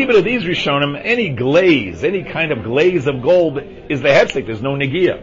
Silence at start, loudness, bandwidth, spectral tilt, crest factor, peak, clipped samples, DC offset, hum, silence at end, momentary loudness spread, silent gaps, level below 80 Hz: 0 s; -15 LUFS; 7.6 kHz; -6 dB/octave; 16 dB; 0 dBFS; under 0.1%; under 0.1%; none; 0 s; 7 LU; none; -44 dBFS